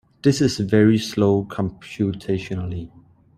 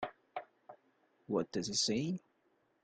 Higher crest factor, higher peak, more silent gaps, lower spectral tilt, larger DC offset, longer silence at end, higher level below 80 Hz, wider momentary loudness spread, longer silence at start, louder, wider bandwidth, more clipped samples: about the same, 18 dB vs 20 dB; first, -2 dBFS vs -22 dBFS; neither; first, -6.5 dB/octave vs -3.5 dB/octave; neither; second, 0.5 s vs 0.65 s; first, -50 dBFS vs -74 dBFS; second, 12 LU vs 16 LU; first, 0.25 s vs 0 s; first, -21 LUFS vs -36 LUFS; first, 14 kHz vs 10 kHz; neither